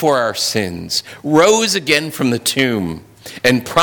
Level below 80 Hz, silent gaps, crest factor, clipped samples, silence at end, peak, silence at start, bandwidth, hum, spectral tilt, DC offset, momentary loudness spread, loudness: -50 dBFS; none; 14 dB; under 0.1%; 0 s; -2 dBFS; 0 s; 19 kHz; none; -3.5 dB/octave; under 0.1%; 10 LU; -15 LUFS